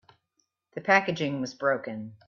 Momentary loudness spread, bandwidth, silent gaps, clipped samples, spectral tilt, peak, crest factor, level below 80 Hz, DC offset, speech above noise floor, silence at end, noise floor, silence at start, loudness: 14 LU; 7.2 kHz; none; under 0.1%; -5 dB/octave; -8 dBFS; 22 dB; -72 dBFS; under 0.1%; 49 dB; 0.15 s; -76 dBFS; 0.75 s; -27 LUFS